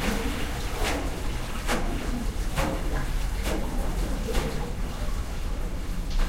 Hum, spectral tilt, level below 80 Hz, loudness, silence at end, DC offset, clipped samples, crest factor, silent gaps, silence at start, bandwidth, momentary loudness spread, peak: none; -4.5 dB/octave; -28 dBFS; -31 LUFS; 0 s; 0.5%; under 0.1%; 16 dB; none; 0 s; 16 kHz; 5 LU; -10 dBFS